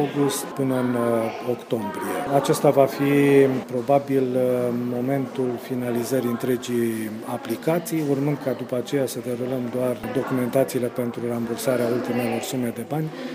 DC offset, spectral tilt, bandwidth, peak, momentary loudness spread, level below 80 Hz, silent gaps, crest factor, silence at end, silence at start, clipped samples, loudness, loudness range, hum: under 0.1%; -6 dB/octave; 15.5 kHz; -4 dBFS; 8 LU; -64 dBFS; none; 20 dB; 0 s; 0 s; under 0.1%; -23 LUFS; 5 LU; none